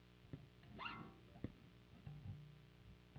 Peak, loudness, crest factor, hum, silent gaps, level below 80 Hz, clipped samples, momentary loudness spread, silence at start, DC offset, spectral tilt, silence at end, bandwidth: -34 dBFS; -57 LUFS; 24 dB; 60 Hz at -70 dBFS; none; -70 dBFS; under 0.1%; 13 LU; 0 s; under 0.1%; -7 dB/octave; 0 s; 9 kHz